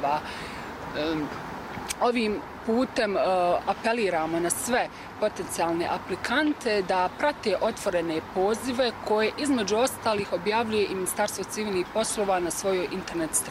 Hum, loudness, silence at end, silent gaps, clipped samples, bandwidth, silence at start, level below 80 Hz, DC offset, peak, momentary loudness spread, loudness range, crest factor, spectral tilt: none; -27 LUFS; 0 s; none; under 0.1%; 16 kHz; 0 s; -54 dBFS; under 0.1%; -10 dBFS; 6 LU; 1 LU; 16 dB; -3.5 dB/octave